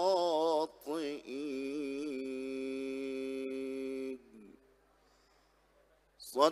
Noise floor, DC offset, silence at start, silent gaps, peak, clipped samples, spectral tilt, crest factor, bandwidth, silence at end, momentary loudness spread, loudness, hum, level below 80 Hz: -69 dBFS; under 0.1%; 0 s; none; -14 dBFS; under 0.1%; -4 dB/octave; 24 dB; 15 kHz; 0 s; 12 LU; -37 LUFS; none; -76 dBFS